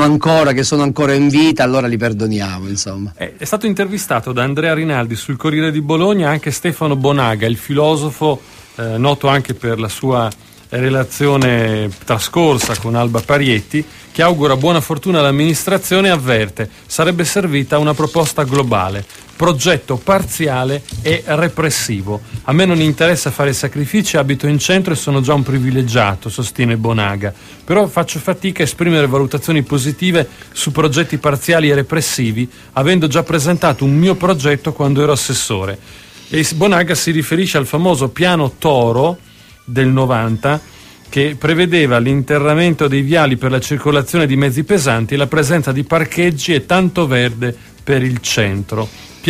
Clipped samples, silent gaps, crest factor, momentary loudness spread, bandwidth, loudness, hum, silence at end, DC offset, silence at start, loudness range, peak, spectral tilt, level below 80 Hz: under 0.1%; none; 14 dB; 8 LU; 15.5 kHz; -14 LUFS; none; 0 s; under 0.1%; 0 s; 2 LU; 0 dBFS; -5 dB/octave; -42 dBFS